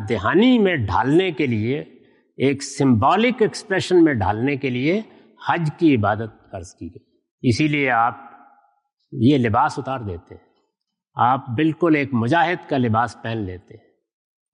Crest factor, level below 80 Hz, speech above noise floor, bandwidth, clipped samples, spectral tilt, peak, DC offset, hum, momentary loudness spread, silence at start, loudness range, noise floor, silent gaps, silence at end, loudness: 14 dB; -58 dBFS; 58 dB; 11 kHz; under 0.1%; -6.5 dB/octave; -6 dBFS; under 0.1%; none; 17 LU; 0 s; 4 LU; -77 dBFS; 7.31-7.38 s; 0.95 s; -19 LUFS